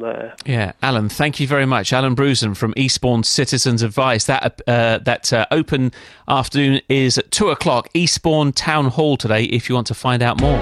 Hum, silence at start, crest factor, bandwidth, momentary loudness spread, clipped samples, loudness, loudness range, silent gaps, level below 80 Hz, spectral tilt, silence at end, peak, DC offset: none; 0 s; 14 dB; 14 kHz; 4 LU; under 0.1%; -17 LUFS; 1 LU; none; -36 dBFS; -4.5 dB/octave; 0 s; -2 dBFS; under 0.1%